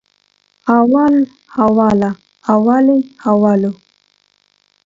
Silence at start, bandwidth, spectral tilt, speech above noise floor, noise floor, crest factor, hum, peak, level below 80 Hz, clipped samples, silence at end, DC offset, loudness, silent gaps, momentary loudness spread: 0.65 s; 7.6 kHz; -9 dB/octave; 47 dB; -60 dBFS; 14 dB; 50 Hz at -35 dBFS; 0 dBFS; -52 dBFS; under 0.1%; 1.1 s; under 0.1%; -13 LUFS; none; 10 LU